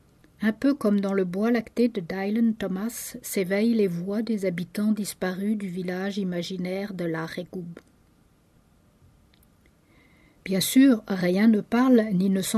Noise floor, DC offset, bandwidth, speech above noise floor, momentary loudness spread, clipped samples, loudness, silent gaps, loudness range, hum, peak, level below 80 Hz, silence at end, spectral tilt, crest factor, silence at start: -61 dBFS; under 0.1%; 13.5 kHz; 36 dB; 11 LU; under 0.1%; -25 LUFS; none; 13 LU; none; -8 dBFS; -62 dBFS; 0 s; -5.5 dB/octave; 16 dB; 0.4 s